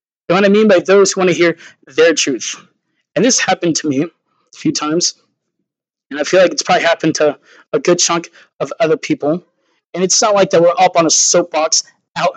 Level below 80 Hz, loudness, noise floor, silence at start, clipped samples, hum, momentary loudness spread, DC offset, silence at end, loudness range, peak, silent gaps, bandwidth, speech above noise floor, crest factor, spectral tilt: -68 dBFS; -13 LUFS; -77 dBFS; 0.3 s; under 0.1%; none; 13 LU; under 0.1%; 0 s; 4 LU; 0 dBFS; 7.68-7.72 s, 8.53-8.59 s, 9.86-9.90 s, 12.11-12.15 s; 9.4 kHz; 64 dB; 14 dB; -3 dB/octave